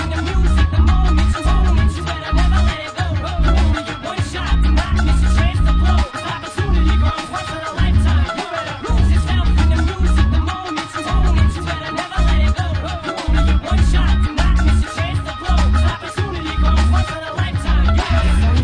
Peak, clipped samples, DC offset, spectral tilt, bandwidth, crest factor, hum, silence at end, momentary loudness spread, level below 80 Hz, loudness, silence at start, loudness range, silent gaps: -4 dBFS; under 0.1%; under 0.1%; -6 dB/octave; 10 kHz; 12 dB; none; 0 s; 7 LU; -16 dBFS; -17 LUFS; 0 s; 1 LU; none